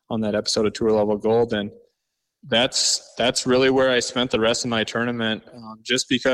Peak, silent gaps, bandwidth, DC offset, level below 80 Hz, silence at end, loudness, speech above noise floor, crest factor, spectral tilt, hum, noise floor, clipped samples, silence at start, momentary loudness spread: -6 dBFS; none; 14 kHz; under 0.1%; -54 dBFS; 0 s; -21 LUFS; 57 dB; 16 dB; -3 dB/octave; none; -79 dBFS; under 0.1%; 0.1 s; 8 LU